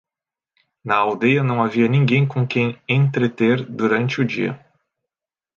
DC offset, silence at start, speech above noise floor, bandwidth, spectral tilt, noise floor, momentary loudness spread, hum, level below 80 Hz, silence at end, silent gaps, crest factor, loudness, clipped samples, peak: under 0.1%; 0.85 s; 71 dB; 7 kHz; -8 dB/octave; -89 dBFS; 5 LU; none; -64 dBFS; 1 s; none; 18 dB; -19 LUFS; under 0.1%; -2 dBFS